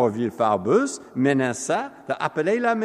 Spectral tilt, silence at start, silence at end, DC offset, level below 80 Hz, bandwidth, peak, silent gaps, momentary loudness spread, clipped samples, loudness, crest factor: -5.5 dB/octave; 0 s; 0 s; under 0.1%; -70 dBFS; 12.5 kHz; -6 dBFS; none; 7 LU; under 0.1%; -23 LUFS; 16 dB